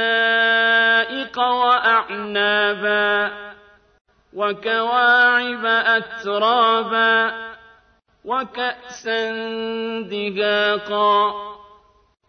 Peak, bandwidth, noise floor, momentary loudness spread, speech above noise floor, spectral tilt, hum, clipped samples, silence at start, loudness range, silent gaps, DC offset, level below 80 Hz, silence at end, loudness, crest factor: -4 dBFS; 6.6 kHz; -57 dBFS; 11 LU; 38 dB; -3.5 dB/octave; none; under 0.1%; 0 s; 6 LU; 4.01-4.05 s; under 0.1%; -64 dBFS; 0.7 s; -18 LUFS; 16 dB